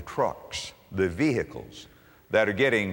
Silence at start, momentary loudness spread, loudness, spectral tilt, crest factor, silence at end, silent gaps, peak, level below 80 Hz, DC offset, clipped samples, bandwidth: 0 s; 17 LU; -27 LUFS; -5 dB/octave; 20 dB; 0 s; none; -8 dBFS; -54 dBFS; under 0.1%; under 0.1%; 16.5 kHz